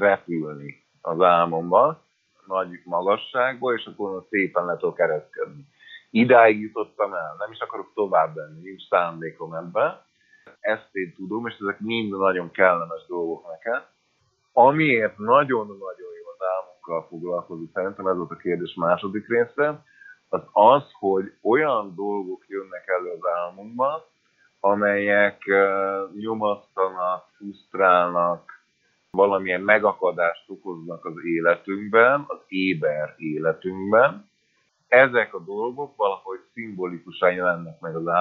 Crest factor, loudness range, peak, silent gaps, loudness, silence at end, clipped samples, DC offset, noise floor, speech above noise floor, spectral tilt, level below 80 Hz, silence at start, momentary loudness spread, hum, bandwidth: 22 dB; 5 LU; 0 dBFS; none; -23 LUFS; 0 s; under 0.1%; under 0.1%; -68 dBFS; 46 dB; -8 dB/octave; -74 dBFS; 0 s; 16 LU; none; 5 kHz